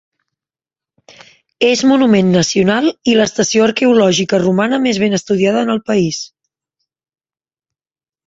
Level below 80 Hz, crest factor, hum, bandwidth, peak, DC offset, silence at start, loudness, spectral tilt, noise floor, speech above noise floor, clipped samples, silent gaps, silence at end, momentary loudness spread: -54 dBFS; 14 dB; none; 8 kHz; -2 dBFS; under 0.1%; 1.6 s; -13 LUFS; -4.5 dB/octave; under -90 dBFS; over 78 dB; under 0.1%; none; 2 s; 5 LU